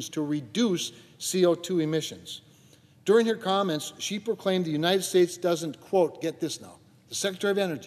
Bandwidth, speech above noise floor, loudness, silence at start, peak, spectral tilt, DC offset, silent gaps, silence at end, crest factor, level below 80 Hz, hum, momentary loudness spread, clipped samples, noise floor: 14 kHz; 30 dB; -27 LUFS; 0 s; -10 dBFS; -4.5 dB/octave; under 0.1%; none; 0 s; 18 dB; -76 dBFS; none; 12 LU; under 0.1%; -57 dBFS